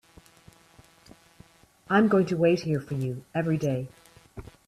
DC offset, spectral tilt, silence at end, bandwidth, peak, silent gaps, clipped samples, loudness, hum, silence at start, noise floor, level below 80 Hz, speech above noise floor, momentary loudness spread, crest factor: under 0.1%; -7.5 dB/octave; 0.25 s; 13.5 kHz; -10 dBFS; none; under 0.1%; -26 LUFS; none; 1.9 s; -57 dBFS; -58 dBFS; 32 dB; 23 LU; 18 dB